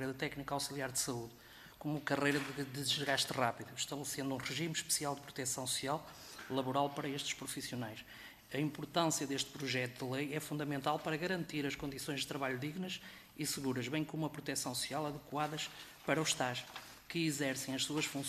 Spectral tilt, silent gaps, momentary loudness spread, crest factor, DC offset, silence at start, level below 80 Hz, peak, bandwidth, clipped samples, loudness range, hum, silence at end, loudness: -3.5 dB/octave; none; 10 LU; 22 dB; under 0.1%; 0 s; -70 dBFS; -16 dBFS; 15 kHz; under 0.1%; 3 LU; none; 0 s; -38 LUFS